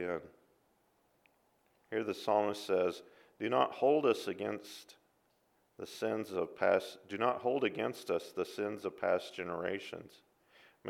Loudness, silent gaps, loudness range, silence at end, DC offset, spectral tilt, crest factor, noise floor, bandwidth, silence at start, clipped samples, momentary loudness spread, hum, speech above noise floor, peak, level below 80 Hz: -35 LUFS; none; 4 LU; 0 s; under 0.1%; -5 dB/octave; 22 dB; -74 dBFS; 16 kHz; 0 s; under 0.1%; 14 LU; none; 39 dB; -14 dBFS; -80 dBFS